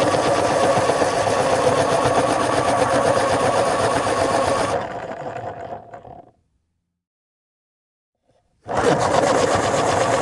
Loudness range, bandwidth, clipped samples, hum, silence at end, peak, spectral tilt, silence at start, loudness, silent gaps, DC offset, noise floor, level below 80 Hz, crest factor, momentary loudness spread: 17 LU; 11.5 kHz; under 0.1%; none; 0 s; -2 dBFS; -4 dB/octave; 0 s; -19 LUFS; 7.07-8.13 s; under 0.1%; -73 dBFS; -48 dBFS; 18 dB; 12 LU